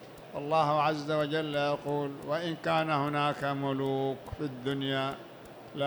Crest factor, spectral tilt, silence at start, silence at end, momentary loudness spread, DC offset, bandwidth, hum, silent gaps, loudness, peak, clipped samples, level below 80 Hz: 16 dB; -6.5 dB/octave; 0 s; 0 s; 11 LU; under 0.1%; 19.5 kHz; none; none; -31 LUFS; -14 dBFS; under 0.1%; -62 dBFS